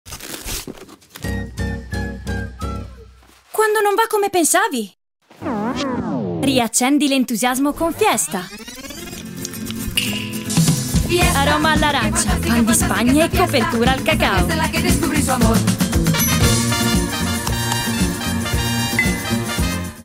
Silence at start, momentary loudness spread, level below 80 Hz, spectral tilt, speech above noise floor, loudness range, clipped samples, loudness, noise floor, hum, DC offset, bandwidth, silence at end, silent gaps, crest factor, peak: 0.05 s; 13 LU; -30 dBFS; -4 dB/octave; 30 dB; 5 LU; under 0.1%; -18 LUFS; -46 dBFS; none; under 0.1%; 16.5 kHz; 0 s; none; 18 dB; -2 dBFS